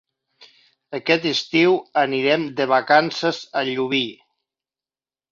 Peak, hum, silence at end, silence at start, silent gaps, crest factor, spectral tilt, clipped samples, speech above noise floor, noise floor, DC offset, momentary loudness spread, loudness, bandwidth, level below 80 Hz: -2 dBFS; none; 1.15 s; 0.4 s; none; 18 dB; -4.5 dB/octave; under 0.1%; over 70 dB; under -90 dBFS; under 0.1%; 8 LU; -20 LUFS; 7.6 kHz; -68 dBFS